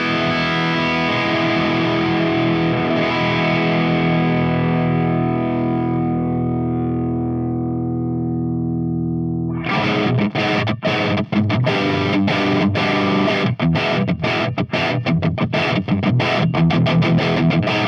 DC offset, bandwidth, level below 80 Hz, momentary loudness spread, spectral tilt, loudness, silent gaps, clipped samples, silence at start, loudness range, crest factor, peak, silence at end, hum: under 0.1%; 6.8 kHz; -48 dBFS; 5 LU; -7.5 dB/octave; -18 LUFS; none; under 0.1%; 0 s; 3 LU; 14 dB; -4 dBFS; 0 s; none